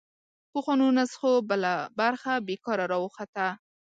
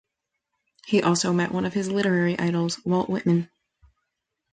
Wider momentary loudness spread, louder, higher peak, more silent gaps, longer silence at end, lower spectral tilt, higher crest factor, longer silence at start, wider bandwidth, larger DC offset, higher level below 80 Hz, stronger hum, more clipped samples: first, 9 LU vs 4 LU; second, -27 LUFS vs -24 LUFS; second, -12 dBFS vs -8 dBFS; first, 3.28-3.33 s vs none; second, 0.4 s vs 1.05 s; about the same, -5 dB/octave vs -5.5 dB/octave; about the same, 16 dB vs 16 dB; second, 0.55 s vs 0.85 s; about the same, 9 kHz vs 9.4 kHz; neither; second, -78 dBFS vs -62 dBFS; neither; neither